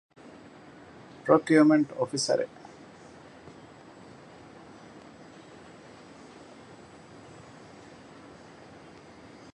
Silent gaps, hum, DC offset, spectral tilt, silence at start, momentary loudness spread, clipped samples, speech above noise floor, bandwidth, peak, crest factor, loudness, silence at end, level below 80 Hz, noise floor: none; none; under 0.1%; -5 dB/octave; 1.25 s; 26 LU; under 0.1%; 27 dB; 11 kHz; -6 dBFS; 26 dB; -24 LUFS; 7.1 s; -70 dBFS; -50 dBFS